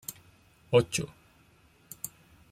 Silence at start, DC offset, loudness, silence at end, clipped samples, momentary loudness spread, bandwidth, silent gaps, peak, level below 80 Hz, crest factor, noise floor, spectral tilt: 0.1 s; under 0.1%; -30 LUFS; 0.45 s; under 0.1%; 17 LU; 16 kHz; none; -10 dBFS; -62 dBFS; 22 dB; -62 dBFS; -4.5 dB/octave